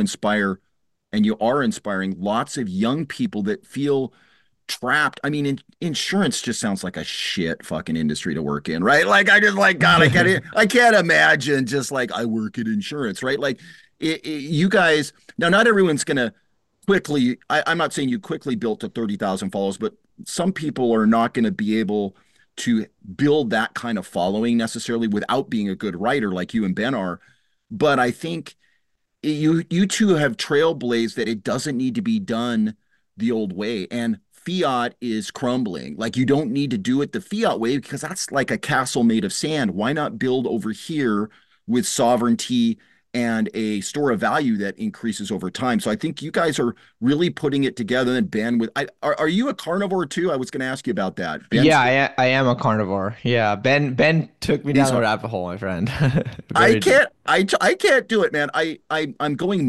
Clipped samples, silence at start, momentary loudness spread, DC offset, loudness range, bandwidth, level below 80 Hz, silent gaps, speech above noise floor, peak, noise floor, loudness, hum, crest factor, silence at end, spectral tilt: under 0.1%; 0 s; 11 LU; 0.1%; 7 LU; 12.5 kHz; -56 dBFS; none; 50 dB; -4 dBFS; -71 dBFS; -21 LUFS; none; 18 dB; 0 s; -5 dB/octave